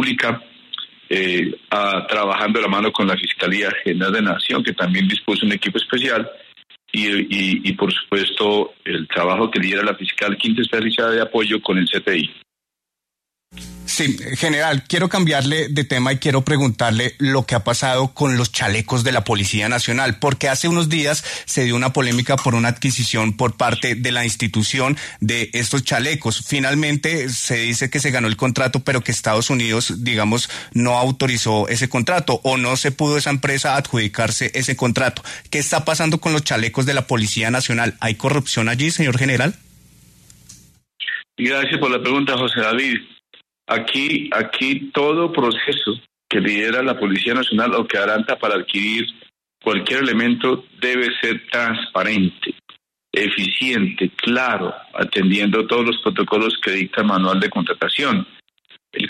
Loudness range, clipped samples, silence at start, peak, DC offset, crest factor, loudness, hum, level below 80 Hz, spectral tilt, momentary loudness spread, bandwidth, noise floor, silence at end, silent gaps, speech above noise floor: 2 LU; under 0.1%; 0 s; -4 dBFS; under 0.1%; 16 dB; -18 LUFS; none; -54 dBFS; -4 dB/octave; 4 LU; 13.5 kHz; -84 dBFS; 0 s; none; 65 dB